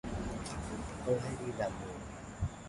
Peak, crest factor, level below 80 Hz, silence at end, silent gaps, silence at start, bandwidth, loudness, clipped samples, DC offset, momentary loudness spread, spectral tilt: -18 dBFS; 20 dB; -48 dBFS; 0 s; none; 0.05 s; 11.5 kHz; -39 LUFS; under 0.1%; under 0.1%; 9 LU; -6 dB/octave